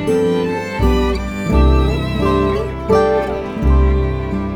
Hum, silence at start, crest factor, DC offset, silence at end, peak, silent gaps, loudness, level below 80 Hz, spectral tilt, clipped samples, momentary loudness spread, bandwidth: none; 0 s; 14 dB; under 0.1%; 0 s; 0 dBFS; none; -16 LUFS; -18 dBFS; -7.5 dB/octave; under 0.1%; 6 LU; 11 kHz